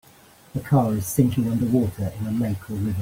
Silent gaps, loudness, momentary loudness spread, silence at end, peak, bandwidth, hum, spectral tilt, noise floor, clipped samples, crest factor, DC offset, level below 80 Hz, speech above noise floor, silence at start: none; -23 LUFS; 8 LU; 0 s; -6 dBFS; 16.5 kHz; none; -7.5 dB/octave; -51 dBFS; under 0.1%; 18 dB; under 0.1%; -50 dBFS; 29 dB; 0.55 s